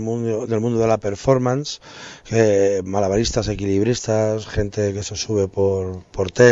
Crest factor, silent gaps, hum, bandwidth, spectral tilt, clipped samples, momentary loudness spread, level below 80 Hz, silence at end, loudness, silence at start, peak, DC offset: 18 dB; none; none; 8 kHz; -5.5 dB/octave; under 0.1%; 9 LU; -40 dBFS; 0 s; -20 LUFS; 0 s; -2 dBFS; under 0.1%